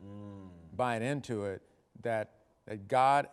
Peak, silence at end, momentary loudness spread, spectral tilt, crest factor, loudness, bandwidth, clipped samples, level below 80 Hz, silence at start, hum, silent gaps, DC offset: -14 dBFS; 0 s; 20 LU; -6 dB/octave; 20 dB; -33 LUFS; 13 kHz; under 0.1%; -72 dBFS; 0 s; none; none; under 0.1%